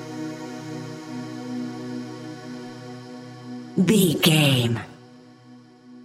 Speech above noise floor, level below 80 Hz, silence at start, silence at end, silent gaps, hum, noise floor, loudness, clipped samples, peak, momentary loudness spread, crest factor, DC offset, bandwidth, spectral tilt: 30 dB; -64 dBFS; 0 s; 0 s; none; none; -48 dBFS; -23 LUFS; under 0.1%; -4 dBFS; 21 LU; 22 dB; under 0.1%; 16 kHz; -5 dB/octave